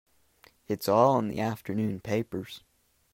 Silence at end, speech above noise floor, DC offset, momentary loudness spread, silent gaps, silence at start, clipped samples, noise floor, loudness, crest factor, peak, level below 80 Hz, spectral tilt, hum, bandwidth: 0.55 s; 34 dB; under 0.1%; 15 LU; none; 0.7 s; under 0.1%; -62 dBFS; -28 LUFS; 22 dB; -8 dBFS; -64 dBFS; -6.5 dB/octave; none; 16 kHz